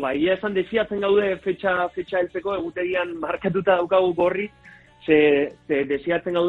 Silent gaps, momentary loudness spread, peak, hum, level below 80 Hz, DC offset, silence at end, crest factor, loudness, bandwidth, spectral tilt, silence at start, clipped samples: none; 8 LU; -4 dBFS; none; -56 dBFS; under 0.1%; 0 s; 18 dB; -22 LUFS; 4.5 kHz; -7.5 dB/octave; 0 s; under 0.1%